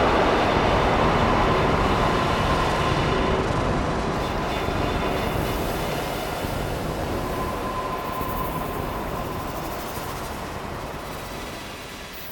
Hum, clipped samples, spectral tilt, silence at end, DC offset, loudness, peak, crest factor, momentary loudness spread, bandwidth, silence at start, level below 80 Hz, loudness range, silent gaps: none; under 0.1%; -5.5 dB/octave; 0 s; under 0.1%; -24 LUFS; -6 dBFS; 18 dB; 12 LU; 19 kHz; 0 s; -34 dBFS; 9 LU; none